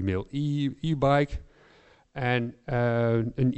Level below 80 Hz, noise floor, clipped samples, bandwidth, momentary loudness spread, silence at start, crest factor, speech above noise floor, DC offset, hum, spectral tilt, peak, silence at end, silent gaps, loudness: -46 dBFS; -58 dBFS; under 0.1%; 8.2 kHz; 8 LU; 0 s; 16 dB; 32 dB; under 0.1%; none; -8 dB/octave; -12 dBFS; 0 s; none; -27 LUFS